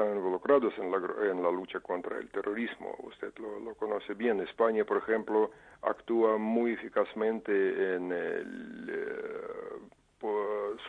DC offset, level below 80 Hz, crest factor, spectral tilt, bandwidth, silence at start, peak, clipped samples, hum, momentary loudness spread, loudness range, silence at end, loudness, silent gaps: under 0.1%; -72 dBFS; 20 dB; -7 dB/octave; 4.5 kHz; 0 s; -12 dBFS; under 0.1%; none; 14 LU; 5 LU; 0 s; -32 LUFS; none